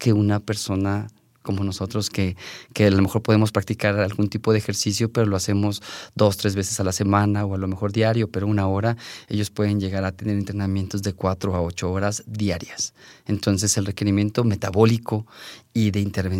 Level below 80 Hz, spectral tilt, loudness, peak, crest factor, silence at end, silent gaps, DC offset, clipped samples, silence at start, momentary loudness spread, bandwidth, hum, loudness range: -56 dBFS; -5.5 dB/octave; -23 LUFS; -4 dBFS; 18 dB; 0 s; none; under 0.1%; under 0.1%; 0 s; 9 LU; 16 kHz; none; 3 LU